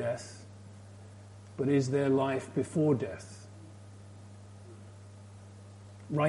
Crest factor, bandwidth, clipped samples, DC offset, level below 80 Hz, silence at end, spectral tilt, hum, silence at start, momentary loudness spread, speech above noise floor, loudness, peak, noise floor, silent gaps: 18 dB; 11.5 kHz; under 0.1%; under 0.1%; -70 dBFS; 0 s; -7 dB/octave; none; 0 s; 23 LU; 21 dB; -31 LUFS; -16 dBFS; -50 dBFS; none